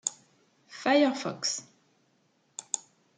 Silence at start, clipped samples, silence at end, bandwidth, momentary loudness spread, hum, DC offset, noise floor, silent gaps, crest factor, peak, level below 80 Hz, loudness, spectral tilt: 0.05 s; under 0.1%; 0.35 s; 9.6 kHz; 21 LU; none; under 0.1%; -70 dBFS; none; 24 dB; -10 dBFS; -86 dBFS; -29 LUFS; -2.5 dB/octave